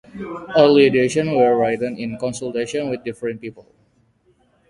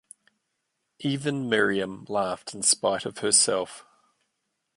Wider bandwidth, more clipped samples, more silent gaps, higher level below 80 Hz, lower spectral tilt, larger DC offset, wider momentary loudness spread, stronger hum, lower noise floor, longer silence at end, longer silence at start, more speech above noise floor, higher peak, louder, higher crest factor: about the same, 11.5 kHz vs 11.5 kHz; neither; neither; first, -56 dBFS vs -68 dBFS; first, -5.5 dB/octave vs -2.5 dB/octave; neither; first, 17 LU vs 11 LU; neither; second, -60 dBFS vs -79 dBFS; first, 1.1 s vs 0.95 s; second, 0.15 s vs 1 s; second, 42 dB vs 53 dB; first, 0 dBFS vs -6 dBFS; first, -18 LUFS vs -24 LUFS; about the same, 20 dB vs 20 dB